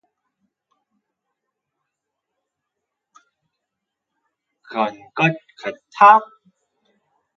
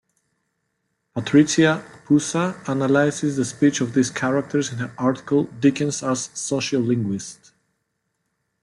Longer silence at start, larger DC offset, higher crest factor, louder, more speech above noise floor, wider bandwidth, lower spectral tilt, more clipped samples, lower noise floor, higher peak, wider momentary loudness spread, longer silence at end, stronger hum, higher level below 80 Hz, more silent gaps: first, 4.7 s vs 1.15 s; neither; first, 24 dB vs 18 dB; first, -16 LUFS vs -21 LUFS; first, 65 dB vs 54 dB; second, 7.2 kHz vs 11.5 kHz; about the same, -6 dB/octave vs -5 dB/octave; neither; first, -81 dBFS vs -75 dBFS; first, 0 dBFS vs -4 dBFS; first, 19 LU vs 9 LU; second, 1.1 s vs 1.3 s; neither; second, -76 dBFS vs -62 dBFS; neither